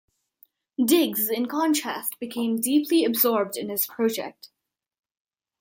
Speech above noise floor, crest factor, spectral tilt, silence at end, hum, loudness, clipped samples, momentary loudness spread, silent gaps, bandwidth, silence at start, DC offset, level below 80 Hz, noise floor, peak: 37 dB; 20 dB; -3 dB/octave; 1.15 s; none; -24 LUFS; under 0.1%; 9 LU; none; 17 kHz; 0.8 s; under 0.1%; -76 dBFS; -61 dBFS; -6 dBFS